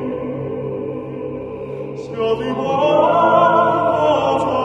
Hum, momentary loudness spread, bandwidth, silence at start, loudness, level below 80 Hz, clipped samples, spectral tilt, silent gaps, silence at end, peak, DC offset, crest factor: none; 15 LU; 9 kHz; 0 s; -17 LUFS; -50 dBFS; under 0.1%; -7 dB/octave; none; 0 s; -2 dBFS; under 0.1%; 16 dB